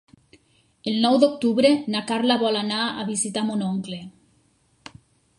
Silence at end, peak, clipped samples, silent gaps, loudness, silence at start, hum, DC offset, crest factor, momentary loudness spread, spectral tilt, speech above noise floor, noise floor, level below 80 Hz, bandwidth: 1.3 s; -4 dBFS; under 0.1%; none; -22 LUFS; 0.85 s; none; under 0.1%; 20 dB; 11 LU; -4 dB/octave; 41 dB; -63 dBFS; -66 dBFS; 11.5 kHz